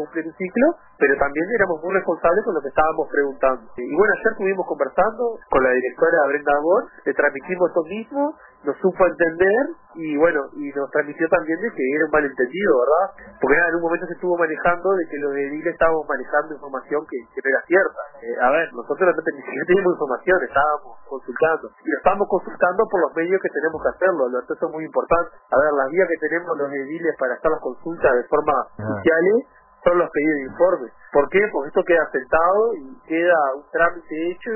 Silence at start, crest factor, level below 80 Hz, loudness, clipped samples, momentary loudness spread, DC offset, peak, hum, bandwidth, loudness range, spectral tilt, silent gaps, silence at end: 0 s; 16 dB; -50 dBFS; -20 LUFS; under 0.1%; 8 LU; under 0.1%; -4 dBFS; none; 3.1 kHz; 2 LU; -10.5 dB/octave; none; 0 s